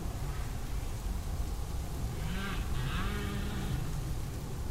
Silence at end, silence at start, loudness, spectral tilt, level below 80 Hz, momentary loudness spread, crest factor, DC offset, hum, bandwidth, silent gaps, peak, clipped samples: 0 s; 0 s; -38 LUFS; -5.5 dB/octave; -38 dBFS; 4 LU; 12 dB; under 0.1%; none; 16 kHz; none; -22 dBFS; under 0.1%